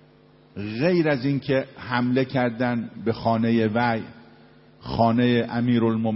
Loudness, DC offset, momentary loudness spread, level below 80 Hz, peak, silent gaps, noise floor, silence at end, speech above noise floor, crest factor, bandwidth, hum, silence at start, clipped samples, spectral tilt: -23 LUFS; under 0.1%; 11 LU; -54 dBFS; -6 dBFS; none; -54 dBFS; 0 s; 31 dB; 18 dB; 5.8 kHz; none; 0.55 s; under 0.1%; -11 dB/octave